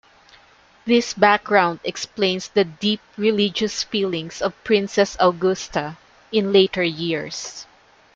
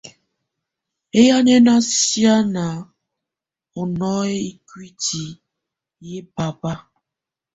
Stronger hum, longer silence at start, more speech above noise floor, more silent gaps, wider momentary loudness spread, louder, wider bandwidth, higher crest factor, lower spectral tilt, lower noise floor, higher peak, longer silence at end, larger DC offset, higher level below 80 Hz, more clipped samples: neither; first, 0.85 s vs 0.05 s; second, 33 dB vs 69 dB; neither; second, 11 LU vs 21 LU; about the same, -20 LUFS vs -18 LUFS; about the same, 7.8 kHz vs 8.2 kHz; about the same, 20 dB vs 18 dB; about the same, -4 dB/octave vs -4 dB/octave; second, -53 dBFS vs -86 dBFS; about the same, 0 dBFS vs -2 dBFS; second, 0.5 s vs 0.75 s; neither; about the same, -56 dBFS vs -56 dBFS; neither